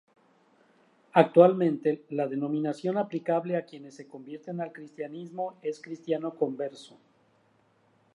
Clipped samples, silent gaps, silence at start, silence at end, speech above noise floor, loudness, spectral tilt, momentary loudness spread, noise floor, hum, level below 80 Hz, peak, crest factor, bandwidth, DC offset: under 0.1%; none; 1.15 s; 1.3 s; 38 dB; -28 LUFS; -8 dB/octave; 21 LU; -66 dBFS; none; -84 dBFS; -4 dBFS; 26 dB; 10.5 kHz; under 0.1%